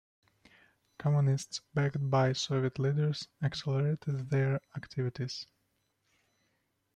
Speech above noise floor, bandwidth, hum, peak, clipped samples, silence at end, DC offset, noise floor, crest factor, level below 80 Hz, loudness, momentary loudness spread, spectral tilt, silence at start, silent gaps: 46 dB; 9.4 kHz; none; -16 dBFS; under 0.1%; 1.5 s; under 0.1%; -78 dBFS; 18 dB; -68 dBFS; -32 LUFS; 9 LU; -6.5 dB/octave; 1 s; none